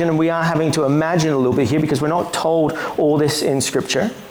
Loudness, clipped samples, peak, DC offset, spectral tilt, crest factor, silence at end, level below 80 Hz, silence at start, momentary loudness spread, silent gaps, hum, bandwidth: -18 LUFS; under 0.1%; -8 dBFS; under 0.1%; -5 dB/octave; 10 dB; 0 s; -50 dBFS; 0 s; 3 LU; none; none; over 20 kHz